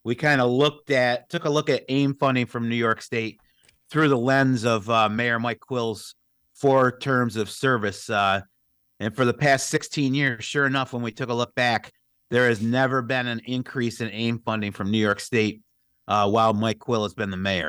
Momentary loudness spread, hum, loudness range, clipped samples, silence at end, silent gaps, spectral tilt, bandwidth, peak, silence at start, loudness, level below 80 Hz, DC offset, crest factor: 8 LU; none; 2 LU; under 0.1%; 0 s; none; -5.5 dB/octave; over 20 kHz; -8 dBFS; 0.05 s; -23 LUFS; -64 dBFS; under 0.1%; 14 dB